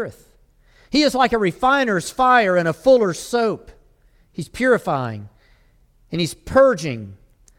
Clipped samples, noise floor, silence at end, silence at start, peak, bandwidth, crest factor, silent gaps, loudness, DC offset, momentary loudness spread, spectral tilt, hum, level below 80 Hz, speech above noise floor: under 0.1%; -55 dBFS; 0.45 s; 0 s; -4 dBFS; 15.5 kHz; 16 dB; none; -18 LUFS; under 0.1%; 17 LU; -5 dB/octave; none; -48 dBFS; 37 dB